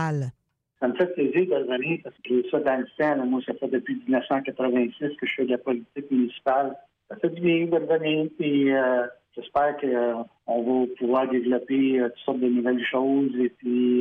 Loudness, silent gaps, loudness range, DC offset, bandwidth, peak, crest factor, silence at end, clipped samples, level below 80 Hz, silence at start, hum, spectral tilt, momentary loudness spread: -25 LUFS; none; 2 LU; under 0.1%; 6.6 kHz; -10 dBFS; 14 dB; 0 s; under 0.1%; -68 dBFS; 0 s; none; -8 dB/octave; 7 LU